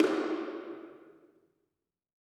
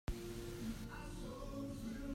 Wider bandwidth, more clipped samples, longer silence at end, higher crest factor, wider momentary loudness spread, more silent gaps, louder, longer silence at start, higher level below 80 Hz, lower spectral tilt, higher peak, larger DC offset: second, 12 kHz vs 16 kHz; neither; first, 1.15 s vs 0 s; first, 22 dB vs 16 dB; first, 22 LU vs 3 LU; neither; first, -35 LUFS vs -48 LUFS; about the same, 0 s vs 0.1 s; second, under -90 dBFS vs -52 dBFS; about the same, -4.5 dB/octave vs -5.5 dB/octave; first, -12 dBFS vs -30 dBFS; neither